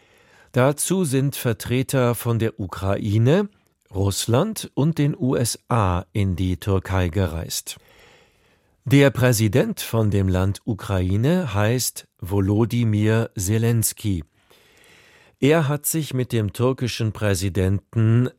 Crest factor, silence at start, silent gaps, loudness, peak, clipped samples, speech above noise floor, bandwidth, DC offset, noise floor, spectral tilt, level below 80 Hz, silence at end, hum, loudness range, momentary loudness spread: 18 dB; 0.55 s; none; -21 LUFS; -4 dBFS; under 0.1%; 40 dB; 16.5 kHz; under 0.1%; -61 dBFS; -5.5 dB/octave; -46 dBFS; 0.1 s; none; 3 LU; 7 LU